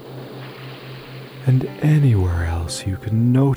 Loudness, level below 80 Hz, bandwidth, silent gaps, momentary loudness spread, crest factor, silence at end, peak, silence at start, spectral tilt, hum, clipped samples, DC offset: -19 LUFS; -36 dBFS; over 20 kHz; none; 19 LU; 14 dB; 0 s; -6 dBFS; 0 s; -7 dB/octave; none; under 0.1%; under 0.1%